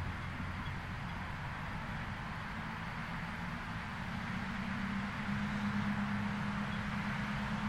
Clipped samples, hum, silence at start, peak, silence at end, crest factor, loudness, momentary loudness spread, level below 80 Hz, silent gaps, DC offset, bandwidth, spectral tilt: under 0.1%; none; 0 s; -24 dBFS; 0 s; 14 dB; -39 LUFS; 5 LU; -52 dBFS; none; under 0.1%; 13.5 kHz; -6 dB/octave